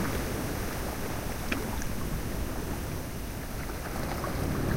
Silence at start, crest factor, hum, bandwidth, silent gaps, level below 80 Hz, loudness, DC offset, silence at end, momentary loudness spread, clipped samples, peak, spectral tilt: 0 s; 20 dB; none; 16 kHz; none; -38 dBFS; -34 LUFS; under 0.1%; 0 s; 5 LU; under 0.1%; -12 dBFS; -5 dB/octave